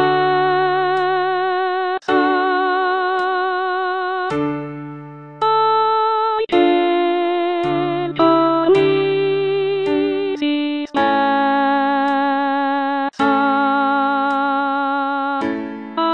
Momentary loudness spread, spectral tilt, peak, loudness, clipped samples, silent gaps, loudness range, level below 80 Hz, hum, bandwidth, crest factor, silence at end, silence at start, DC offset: 6 LU; -6.5 dB/octave; -2 dBFS; -17 LUFS; under 0.1%; none; 3 LU; -60 dBFS; none; 7.4 kHz; 14 dB; 0 s; 0 s; 0.3%